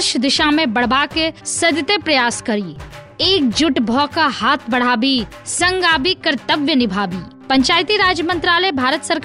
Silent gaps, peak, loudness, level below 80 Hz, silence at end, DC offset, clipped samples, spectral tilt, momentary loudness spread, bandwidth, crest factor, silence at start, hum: none; -4 dBFS; -15 LUFS; -44 dBFS; 0 s; under 0.1%; under 0.1%; -3 dB/octave; 7 LU; 11.5 kHz; 14 dB; 0 s; none